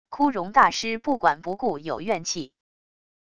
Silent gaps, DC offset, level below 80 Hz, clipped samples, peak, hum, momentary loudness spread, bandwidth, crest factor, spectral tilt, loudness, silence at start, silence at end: none; 0.4%; -60 dBFS; under 0.1%; -4 dBFS; none; 11 LU; 11 kHz; 22 dB; -3.5 dB/octave; -24 LUFS; 0.05 s; 0.65 s